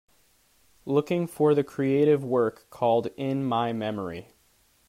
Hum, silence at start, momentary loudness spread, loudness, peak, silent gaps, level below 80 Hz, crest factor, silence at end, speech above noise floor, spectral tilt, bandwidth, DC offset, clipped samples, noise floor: none; 0.85 s; 10 LU; -26 LUFS; -10 dBFS; none; -68 dBFS; 16 dB; 0.65 s; 39 dB; -7.5 dB/octave; 15.5 kHz; under 0.1%; under 0.1%; -64 dBFS